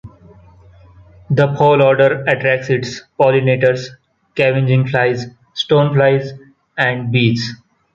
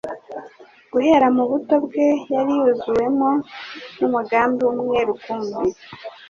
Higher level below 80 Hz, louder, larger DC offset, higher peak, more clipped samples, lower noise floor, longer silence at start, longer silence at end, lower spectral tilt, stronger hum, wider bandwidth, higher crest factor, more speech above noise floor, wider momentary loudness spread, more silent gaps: first, -52 dBFS vs -58 dBFS; first, -15 LUFS vs -19 LUFS; neither; first, 0 dBFS vs -4 dBFS; neither; about the same, -44 dBFS vs -45 dBFS; about the same, 0.05 s vs 0.05 s; first, 0.4 s vs 0.05 s; about the same, -7 dB/octave vs -6 dB/octave; neither; about the same, 7.4 kHz vs 7 kHz; about the same, 14 dB vs 16 dB; first, 30 dB vs 26 dB; second, 14 LU vs 17 LU; neither